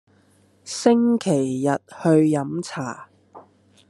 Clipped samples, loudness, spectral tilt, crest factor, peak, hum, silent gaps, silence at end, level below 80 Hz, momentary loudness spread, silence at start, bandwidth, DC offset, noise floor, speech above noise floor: under 0.1%; -21 LUFS; -6 dB/octave; 20 dB; -4 dBFS; 50 Hz at -55 dBFS; none; 0.5 s; -70 dBFS; 14 LU; 0.65 s; 12 kHz; under 0.1%; -58 dBFS; 38 dB